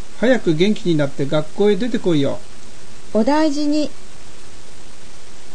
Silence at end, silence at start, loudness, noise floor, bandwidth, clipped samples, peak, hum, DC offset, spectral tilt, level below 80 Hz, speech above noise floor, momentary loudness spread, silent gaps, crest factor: 0 s; 0 s; -18 LUFS; -41 dBFS; 9.8 kHz; under 0.1%; -4 dBFS; none; 10%; -6 dB/octave; -48 dBFS; 23 dB; 6 LU; none; 16 dB